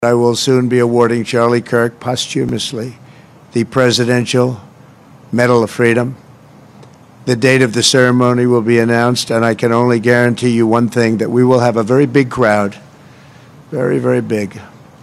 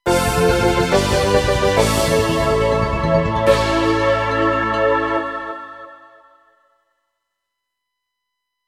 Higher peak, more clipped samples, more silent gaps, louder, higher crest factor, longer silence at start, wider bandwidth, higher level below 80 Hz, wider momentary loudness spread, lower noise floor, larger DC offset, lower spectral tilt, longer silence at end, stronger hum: about the same, 0 dBFS vs 0 dBFS; neither; neither; first, -13 LUFS vs -17 LUFS; about the same, 14 dB vs 18 dB; about the same, 0 s vs 0.05 s; second, 13.5 kHz vs 16 kHz; second, -54 dBFS vs -32 dBFS; about the same, 9 LU vs 8 LU; second, -41 dBFS vs -78 dBFS; neither; about the same, -5.5 dB/octave vs -5 dB/octave; second, 0.35 s vs 2.75 s; neither